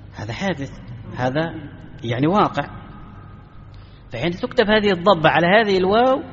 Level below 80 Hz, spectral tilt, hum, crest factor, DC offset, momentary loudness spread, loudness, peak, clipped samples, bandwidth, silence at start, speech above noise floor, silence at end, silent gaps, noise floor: -44 dBFS; -4 dB/octave; none; 18 dB; under 0.1%; 20 LU; -18 LUFS; -2 dBFS; under 0.1%; 7.6 kHz; 0 s; 22 dB; 0 s; none; -41 dBFS